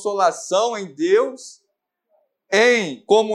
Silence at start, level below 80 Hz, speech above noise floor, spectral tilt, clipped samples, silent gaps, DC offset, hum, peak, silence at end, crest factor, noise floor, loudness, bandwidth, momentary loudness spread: 0 s; -78 dBFS; 56 dB; -3 dB/octave; under 0.1%; none; under 0.1%; none; -2 dBFS; 0 s; 18 dB; -75 dBFS; -19 LUFS; 12 kHz; 11 LU